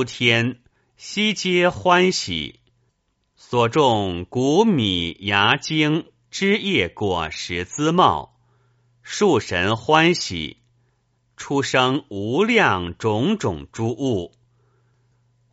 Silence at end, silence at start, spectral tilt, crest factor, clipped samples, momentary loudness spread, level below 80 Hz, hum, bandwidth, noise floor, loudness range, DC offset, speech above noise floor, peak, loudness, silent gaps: 1.25 s; 0 s; -3.5 dB/octave; 20 dB; under 0.1%; 10 LU; -52 dBFS; none; 8 kHz; -69 dBFS; 2 LU; under 0.1%; 49 dB; 0 dBFS; -20 LUFS; none